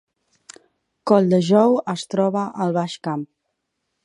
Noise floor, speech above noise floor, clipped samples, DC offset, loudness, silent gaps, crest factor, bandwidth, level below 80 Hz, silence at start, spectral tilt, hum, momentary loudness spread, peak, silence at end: -76 dBFS; 57 dB; under 0.1%; under 0.1%; -20 LUFS; none; 20 dB; 11 kHz; -70 dBFS; 1.05 s; -7 dB/octave; none; 13 LU; -2 dBFS; 0.8 s